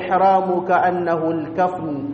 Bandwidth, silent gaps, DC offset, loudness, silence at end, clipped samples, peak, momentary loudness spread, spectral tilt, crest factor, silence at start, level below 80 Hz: 6.4 kHz; none; under 0.1%; -19 LUFS; 0 s; under 0.1%; -4 dBFS; 6 LU; -8 dB/octave; 14 dB; 0 s; -58 dBFS